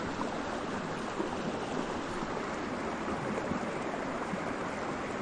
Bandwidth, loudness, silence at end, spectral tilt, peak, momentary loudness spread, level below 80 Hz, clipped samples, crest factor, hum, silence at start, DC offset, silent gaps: 10 kHz; -36 LUFS; 0 s; -5 dB/octave; -20 dBFS; 1 LU; -56 dBFS; under 0.1%; 16 dB; none; 0 s; under 0.1%; none